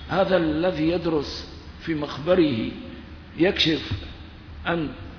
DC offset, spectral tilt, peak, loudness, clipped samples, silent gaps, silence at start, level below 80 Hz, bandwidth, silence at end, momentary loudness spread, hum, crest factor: under 0.1%; -6 dB/octave; -6 dBFS; -24 LUFS; under 0.1%; none; 0 s; -42 dBFS; 5.4 kHz; 0 s; 19 LU; none; 18 dB